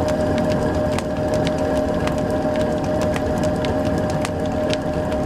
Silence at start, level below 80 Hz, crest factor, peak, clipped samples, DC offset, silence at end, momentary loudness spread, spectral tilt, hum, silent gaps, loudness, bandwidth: 0 s; -36 dBFS; 20 dB; 0 dBFS; under 0.1%; under 0.1%; 0 s; 2 LU; -6.5 dB/octave; none; none; -21 LUFS; 15 kHz